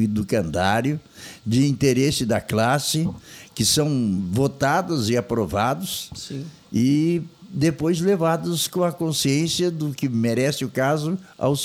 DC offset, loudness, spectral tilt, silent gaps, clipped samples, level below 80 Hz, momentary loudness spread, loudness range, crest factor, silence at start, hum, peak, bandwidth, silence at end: under 0.1%; -22 LUFS; -5 dB/octave; none; under 0.1%; -50 dBFS; 9 LU; 2 LU; 16 dB; 0 s; none; -6 dBFS; 19 kHz; 0 s